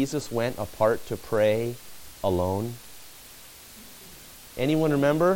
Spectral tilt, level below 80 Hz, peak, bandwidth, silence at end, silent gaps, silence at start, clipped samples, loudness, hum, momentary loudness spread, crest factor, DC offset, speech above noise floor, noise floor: -6 dB/octave; -52 dBFS; -10 dBFS; 17 kHz; 0 s; none; 0 s; under 0.1%; -26 LUFS; none; 22 LU; 18 dB; under 0.1%; 22 dB; -47 dBFS